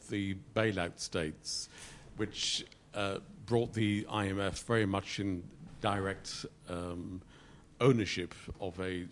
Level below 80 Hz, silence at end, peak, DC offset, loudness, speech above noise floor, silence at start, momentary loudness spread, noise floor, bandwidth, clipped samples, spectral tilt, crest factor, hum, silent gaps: -60 dBFS; 0 s; -14 dBFS; under 0.1%; -35 LUFS; 22 dB; 0 s; 12 LU; -57 dBFS; 11.5 kHz; under 0.1%; -5 dB/octave; 22 dB; none; none